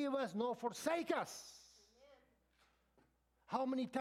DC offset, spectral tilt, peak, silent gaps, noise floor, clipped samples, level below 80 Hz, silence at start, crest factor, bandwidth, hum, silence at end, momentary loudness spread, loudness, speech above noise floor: under 0.1%; -4 dB/octave; -24 dBFS; none; -76 dBFS; under 0.1%; -82 dBFS; 0 s; 20 dB; 16 kHz; none; 0 s; 13 LU; -41 LUFS; 36 dB